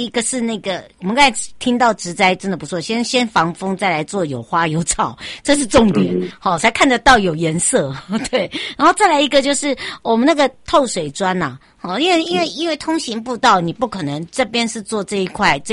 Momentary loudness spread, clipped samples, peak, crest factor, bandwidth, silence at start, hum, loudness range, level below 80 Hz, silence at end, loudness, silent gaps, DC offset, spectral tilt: 10 LU; under 0.1%; 0 dBFS; 16 dB; 11.5 kHz; 0 s; none; 3 LU; -42 dBFS; 0 s; -16 LUFS; none; under 0.1%; -3.5 dB/octave